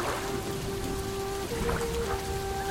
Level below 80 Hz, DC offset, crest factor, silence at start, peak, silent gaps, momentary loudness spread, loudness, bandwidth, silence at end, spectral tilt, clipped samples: -40 dBFS; under 0.1%; 16 dB; 0 s; -16 dBFS; none; 3 LU; -32 LUFS; 16.5 kHz; 0 s; -4.5 dB/octave; under 0.1%